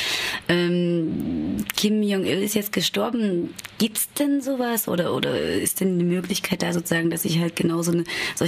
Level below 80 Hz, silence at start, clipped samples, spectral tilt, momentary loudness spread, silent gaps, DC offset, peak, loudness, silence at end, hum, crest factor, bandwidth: -54 dBFS; 0 s; under 0.1%; -4.5 dB/octave; 4 LU; none; under 0.1%; -2 dBFS; -23 LUFS; 0 s; none; 20 dB; 15.5 kHz